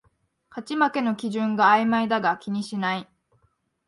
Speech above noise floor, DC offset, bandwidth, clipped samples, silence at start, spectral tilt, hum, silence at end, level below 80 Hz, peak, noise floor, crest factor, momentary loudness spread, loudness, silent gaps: 45 dB; under 0.1%; 11.5 kHz; under 0.1%; 0.55 s; -5.5 dB/octave; none; 0.85 s; -72 dBFS; -6 dBFS; -68 dBFS; 20 dB; 13 LU; -23 LUFS; none